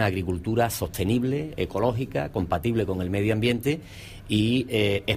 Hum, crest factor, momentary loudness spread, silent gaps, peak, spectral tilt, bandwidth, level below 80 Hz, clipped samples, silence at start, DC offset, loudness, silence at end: none; 16 dB; 5 LU; none; -8 dBFS; -6 dB/octave; 15.5 kHz; -46 dBFS; under 0.1%; 0 s; under 0.1%; -26 LUFS; 0 s